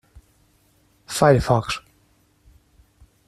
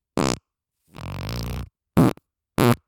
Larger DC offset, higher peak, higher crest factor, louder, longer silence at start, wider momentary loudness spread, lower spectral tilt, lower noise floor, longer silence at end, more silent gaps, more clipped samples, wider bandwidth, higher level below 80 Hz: neither; about the same, -2 dBFS vs 0 dBFS; about the same, 22 dB vs 24 dB; first, -20 LUFS vs -24 LUFS; first, 1.1 s vs 0.15 s; about the same, 14 LU vs 16 LU; about the same, -5.5 dB/octave vs -6 dB/octave; second, -61 dBFS vs -74 dBFS; first, 1.5 s vs 0.1 s; neither; neither; second, 14 kHz vs 19.5 kHz; about the same, -44 dBFS vs -42 dBFS